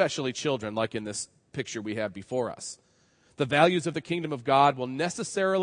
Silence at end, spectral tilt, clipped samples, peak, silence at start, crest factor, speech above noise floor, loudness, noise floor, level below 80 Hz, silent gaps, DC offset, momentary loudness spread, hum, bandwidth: 0 s; -4.5 dB/octave; under 0.1%; -6 dBFS; 0 s; 22 dB; 37 dB; -28 LUFS; -64 dBFS; -70 dBFS; none; under 0.1%; 14 LU; none; 10.5 kHz